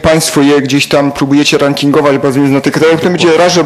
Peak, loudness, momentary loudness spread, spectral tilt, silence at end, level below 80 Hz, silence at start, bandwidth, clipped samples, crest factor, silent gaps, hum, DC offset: 0 dBFS; -9 LUFS; 2 LU; -4.5 dB/octave; 0 s; -38 dBFS; 0 s; 14 kHz; 0.4%; 8 dB; none; none; under 0.1%